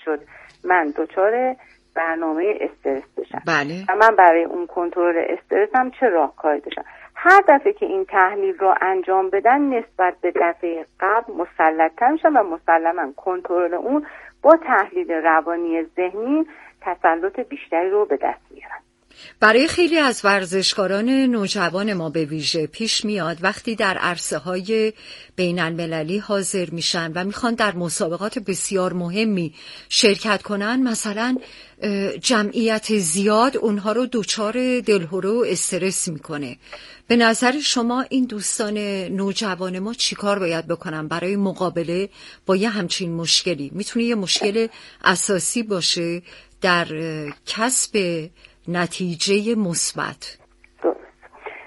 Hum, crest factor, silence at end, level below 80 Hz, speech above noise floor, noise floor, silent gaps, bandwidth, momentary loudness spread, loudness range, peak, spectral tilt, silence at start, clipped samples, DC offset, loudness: none; 20 dB; 0 s; -60 dBFS; 25 dB; -45 dBFS; none; 11.5 kHz; 11 LU; 5 LU; 0 dBFS; -3.5 dB/octave; 0.05 s; under 0.1%; under 0.1%; -20 LUFS